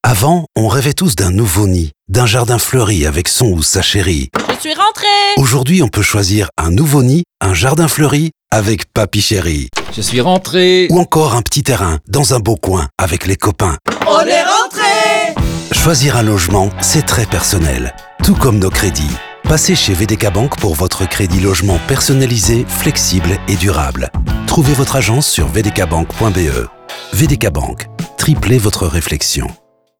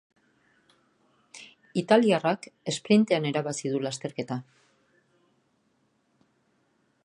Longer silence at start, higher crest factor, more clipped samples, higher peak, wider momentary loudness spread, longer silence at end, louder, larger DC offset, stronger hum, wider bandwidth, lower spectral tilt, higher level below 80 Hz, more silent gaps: second, 0.05 s vs 1.35 s; second, 12 dB vs 24 dB; neither; first, 0 dBFS vs -6 dBFS; second, 7 LU vs 15 LU; second, 0.45 s vs 2.65 s; first, -12 LUFS vs -26 LUFS; first, 0.3% vs under 0.1%; neither; first, over 20 kHz vs 11 kHz; about the same, -4.5 dB/octave vs -5 dB/octave; first, -26 dBFS vs -76 dBFS; neither